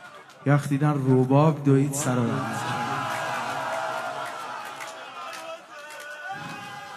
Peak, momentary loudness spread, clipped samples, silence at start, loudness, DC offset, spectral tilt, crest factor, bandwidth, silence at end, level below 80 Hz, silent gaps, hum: -8 dBFS; 17 LU; under 0.1%; 0 s; -25 LUFS; under 0.1%; -6 dB/octave; 18 dB; 13.5 kHz; 0 s; -68 dBFS; none; none